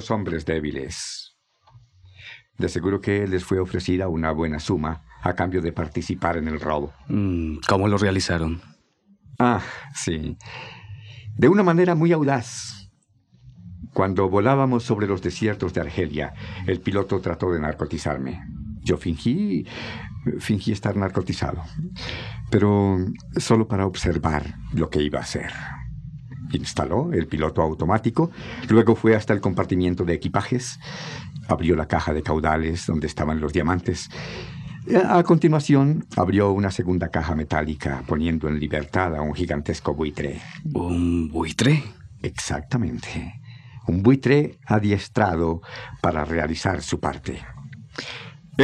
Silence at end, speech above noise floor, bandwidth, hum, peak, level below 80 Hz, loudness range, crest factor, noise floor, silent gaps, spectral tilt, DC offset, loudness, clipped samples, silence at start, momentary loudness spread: 0 s; 37 dB; 12 kHz; none; -4 dBFS; -42 dBFS; 5 LU; 20 dB; -60 dBFS; none; -6.5 dB/octave; under 0.1%; -23 LUFS; under 0.1%; 0 s; 15 LU